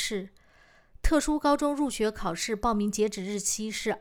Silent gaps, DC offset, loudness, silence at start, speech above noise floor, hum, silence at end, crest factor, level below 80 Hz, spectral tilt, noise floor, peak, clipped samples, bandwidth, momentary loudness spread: none; under 0.1%; -28 LUFS; 0 s; 31 dB; none; 0 s; 18 dB; -38 dBFS; -3.5 dB/octave; -59 dBFS; -10 dBFS; under 0.1%; 18 kHz; 7 LU